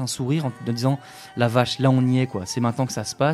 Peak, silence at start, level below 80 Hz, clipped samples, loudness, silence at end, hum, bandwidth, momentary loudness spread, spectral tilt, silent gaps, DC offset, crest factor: -4 dBFS; 0 s; -58 dBFS; under 0.1%; -23 LUFS; 0 s; none; 13.5 kHz; 7 LU; -6 dB/octave; none; under 0.1%; 18 dB